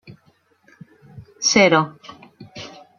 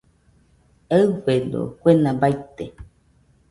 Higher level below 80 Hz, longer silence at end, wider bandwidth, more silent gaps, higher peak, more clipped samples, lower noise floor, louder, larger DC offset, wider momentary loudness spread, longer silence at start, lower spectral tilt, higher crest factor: second, -60 dBFS vs -52 dBFS; second, 0.3 s vs 0.65 s; about the same, 11 kHz vs 11.5 kHz; neither; about the same, -2 dBFS vs -2 dBFS; neither; about the same, -60 dBFS vs -58 dBFS; first, -16 LUFS vs -20 LUFS; neither; first, 23 LU vs 18 LU; first, 1.15 s vs 0.9 s; second, -3 dB/octave vs -8 dB/octave; about the same, 22 dB vs 20 dB